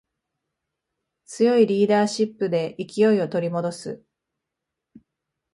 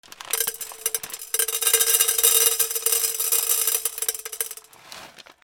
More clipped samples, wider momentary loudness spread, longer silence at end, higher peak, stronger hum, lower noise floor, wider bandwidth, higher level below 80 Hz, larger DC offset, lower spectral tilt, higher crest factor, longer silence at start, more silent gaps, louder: neither; first, 17 LU vs 14 LU; first, 1.55 s vs 0.25 s; second, -6 dBFS vs -2 dBFS; neither; first, -84 dBFS vs -44 dBFS; second, 11.5 kHz vs over 20 kHz; about the same, -70 dBFS vs -66 dBFS; neither; first, -6 dB/octave vs 3.5 dB/octave; second, 18 dB vs 24 dB; first, 1.3 s vs 0.2 s; neither; about the same, -21 LUFS vs -20 LUFS